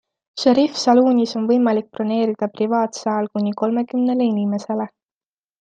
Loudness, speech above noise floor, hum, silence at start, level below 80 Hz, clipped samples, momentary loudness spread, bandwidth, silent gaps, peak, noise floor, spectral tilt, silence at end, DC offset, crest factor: -19 LUFS; over 72 dB; none; 0.35 s; -68 dBFS; under 0.1%; 8 LU; 9 kHz; none; -2 dBFS; under -90 dBFS; -5.5 dB/octave; 0.75 s; under 0.1%; 16 dB